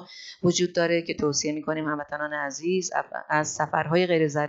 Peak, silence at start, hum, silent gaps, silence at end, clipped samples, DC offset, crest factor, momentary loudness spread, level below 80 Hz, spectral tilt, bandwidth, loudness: -8 dBFS; 0 s; none; none; 0 s; under 0.1%; under 0.1%; 18 dB; 7 LU; -64 dBFS; -4 dB/octave; 8 kHz; -26 LUFS